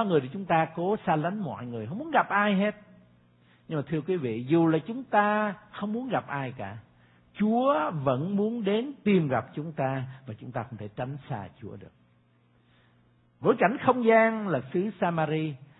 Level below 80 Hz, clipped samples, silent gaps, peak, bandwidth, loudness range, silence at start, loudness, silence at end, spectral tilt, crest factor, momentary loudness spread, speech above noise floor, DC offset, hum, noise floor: -68 dBFS; under 0.1%; none; -6 dBFS; 4.1 kHz; 8 LU; 0 s; -27 LUFS; 0.15 s; -11 dB/octave; 22 dB; 13 LU; 37 dB; under 0.1%; none; -64 dBFS